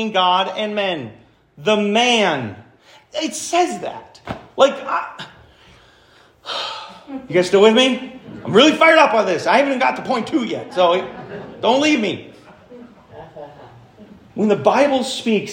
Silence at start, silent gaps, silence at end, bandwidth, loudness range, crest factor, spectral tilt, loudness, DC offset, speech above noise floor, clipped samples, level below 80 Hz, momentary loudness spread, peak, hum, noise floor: 0 s; none; 0 s; 16 kHz; 8 LU; 18 dB; -4 dB/octave; -17 LUFS; under 0.1%; 34 dB; under 0.1%; -60 dBFS; 21 LU; 0 dBFS; none; -51 dBFS